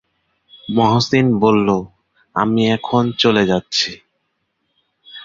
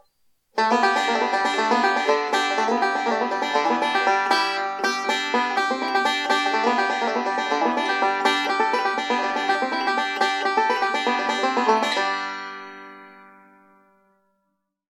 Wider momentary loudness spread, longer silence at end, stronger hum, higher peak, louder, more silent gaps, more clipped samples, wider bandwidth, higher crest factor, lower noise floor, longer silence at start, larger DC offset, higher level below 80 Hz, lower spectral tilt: first, 10 LU vs 4 LU; second, 0 s vs 1.65 s; neither; first, -2 dBFS vs -6 dBFS; first, -16 LUFS vs -21 LUFS; neither; neither; second, 7.6 kHz vs 14.5 kHz; about the same, 16 dB vs 16 dB; second, -70 dBFS vs -75 dBFS; about the same, 0.65 s vs 0.55 s; neither; first, -50 dBFS vs -82 dBFS; first, -5.5 dB/octave vs -2 dB/octave